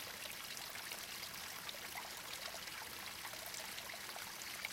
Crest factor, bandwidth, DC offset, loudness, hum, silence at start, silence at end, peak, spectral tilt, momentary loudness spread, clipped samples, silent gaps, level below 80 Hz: 22 dB; 17 kHz; under 0.1%; -46 LUFS; none; 0 s; 0 s; -26 dBFS; -0.5 dB/octave; 1 LU; under 0.1%; none; -74 dBFS